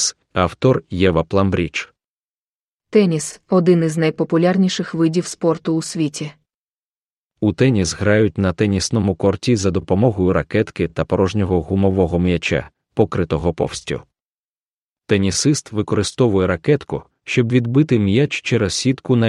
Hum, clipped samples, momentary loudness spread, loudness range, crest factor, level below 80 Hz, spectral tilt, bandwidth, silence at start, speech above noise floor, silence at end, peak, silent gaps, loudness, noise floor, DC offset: none; under 0.1%; 7 LU; 3 LU; 18 dB; -42 dBFS; -5.5 dB/octave; 12 kHz; 0 s; over 73 dB; 0 s; 0 dBFS; 2.08-2.78 s, 6.54-7.30 s, 14.22-14.96 s; -18 LUFS; under -90 dBFS; under 0.1%